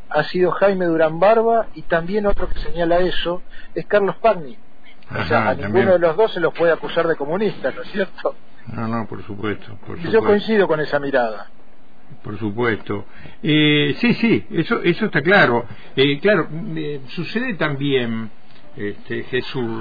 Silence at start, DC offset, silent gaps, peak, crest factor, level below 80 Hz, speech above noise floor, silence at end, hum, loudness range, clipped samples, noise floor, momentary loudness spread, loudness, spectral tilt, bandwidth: 0.1 s; 4%; none; -4 dBFS; 16 dB; -38 dBFS; 31 dB; 0 s; none; 5 LU; under 0.1%; -50 dBFS; 14 LU; -19 LUFS; -8.5 dB/octave; 5 kHz